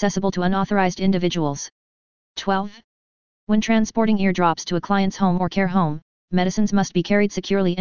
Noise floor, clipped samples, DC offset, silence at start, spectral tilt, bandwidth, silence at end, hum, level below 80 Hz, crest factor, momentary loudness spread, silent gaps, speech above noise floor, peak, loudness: under -90 dBFS; under 0.1%; 2%; 0 s; -6 dB/octave; 7.2 kHz; 0 s; none; -48 dBFS; 18 dB; 7 LU; 1.72-2.35 s, 2.84-3.47 s, 6.02-6.28 s; over 70 dB; -4 dBFS; -21 LUFS